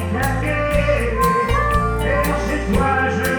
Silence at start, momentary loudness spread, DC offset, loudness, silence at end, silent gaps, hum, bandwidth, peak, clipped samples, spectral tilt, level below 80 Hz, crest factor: 0 s; 3 LU; under 0.1%; -18 LUFS; 0 s; none; none; over 20 kHz; -4 dBFS; under 0.1%; -6 dB/octave; -24 dBFS; 14 dB